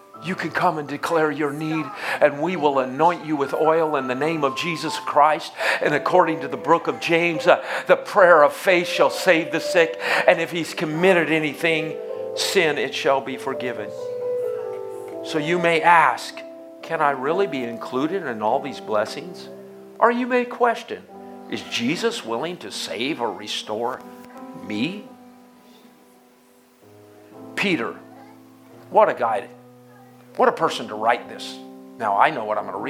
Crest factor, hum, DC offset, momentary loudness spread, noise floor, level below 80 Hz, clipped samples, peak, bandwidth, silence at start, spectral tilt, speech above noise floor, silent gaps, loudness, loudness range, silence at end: 22 dB; none; under 0.1%; 15 LU; -54 dBFS; -74 dBFS; under 0.1%; 0 dBFS; 16 kHz; 0.15 s; -4.5 dB/octave; 33 dB; none; -21 LUFS; 11 LU; 0 s